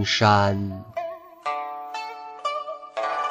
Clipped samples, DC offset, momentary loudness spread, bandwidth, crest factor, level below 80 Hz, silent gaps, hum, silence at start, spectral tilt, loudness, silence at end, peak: under 0.1%; under 0.1%; 15 LU; 9.4 kHz; 20 dB; -60 dBFS; none; none; 0 s; -5 dB/octave; -25 LUFS; 0 s; -4 dBFS